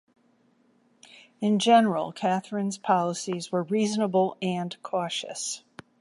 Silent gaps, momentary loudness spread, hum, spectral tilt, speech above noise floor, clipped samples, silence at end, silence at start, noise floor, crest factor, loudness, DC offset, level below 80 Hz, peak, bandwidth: none; 12 LU; none; -4.5 dB/octave; 39 dB; under 0.1%; 0.45 s; 1.4 s; -65 dBFS; 20 dB; -26 LUFS; under 0.1%; -76 dBFS; -8 dBFS; 11.5 kHz